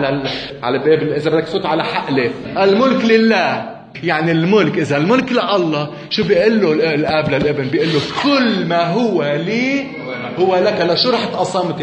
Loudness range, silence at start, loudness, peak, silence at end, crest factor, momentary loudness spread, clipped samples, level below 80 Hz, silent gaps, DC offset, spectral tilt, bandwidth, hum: 2 LU; 0 s; -15 LUFS; 0 dBFS; 0 s; 14 dB; 8 LU; under 0.1%; -50 dBFS; none; under 0.1%; -6 dB/octave; 9.4 kHz; none